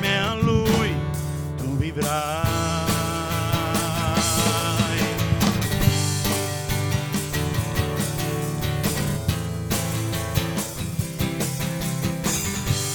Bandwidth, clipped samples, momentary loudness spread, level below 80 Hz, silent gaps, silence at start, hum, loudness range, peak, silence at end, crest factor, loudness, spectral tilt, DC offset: 19.5 kHz; under 0.1%; 6 LU; -38 dBFS; none; 0 s; none; 4 LU; -6 dBFS; 0 s; 18 dB; -24 LUFS; -4.5 dB/octave; 0.1%